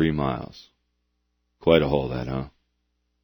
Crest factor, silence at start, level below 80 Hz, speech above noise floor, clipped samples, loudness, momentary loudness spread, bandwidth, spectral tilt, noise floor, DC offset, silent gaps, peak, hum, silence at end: 24 dB; 0 s; -44 dBFS; 51 dB; under 0.1%; -24 LUFS; 17 LU; over 20 kHz; -8.5 dB/octave; -74 dBFS; under 0.1%; none; -2 dBFS; 60 Hz at -55 dBFS; 0.75 s